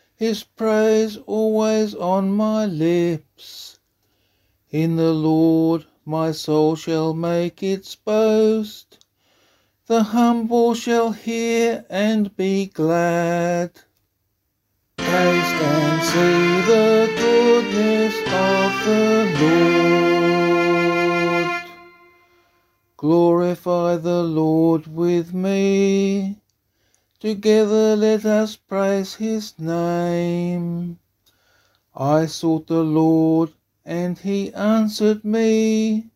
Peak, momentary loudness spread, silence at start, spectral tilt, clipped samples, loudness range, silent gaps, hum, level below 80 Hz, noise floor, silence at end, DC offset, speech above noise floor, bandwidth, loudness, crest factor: -4 dBFS; 9 LU; 0.2 s; -6 dB/octave; under 0.1%; 5 LU; none; none; -60 dBFS; -71 dBFS; 0.1 s; under 0.1%; 53 dB; 15.5 kHz; -19 LUFS; 16 dB